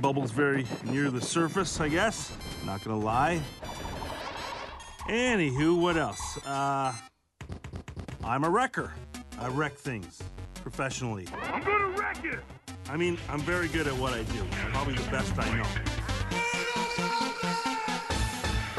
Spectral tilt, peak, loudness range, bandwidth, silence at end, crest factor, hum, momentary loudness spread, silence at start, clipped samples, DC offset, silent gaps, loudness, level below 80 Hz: -4.5 dB/octave; -12 dBFS; 3 LU; 12 kHz; 0 s; 18 dB; none; 14 LU; 0 s; under 0.1%; under 0.1%; none; -30 LUFS; -44 dBFS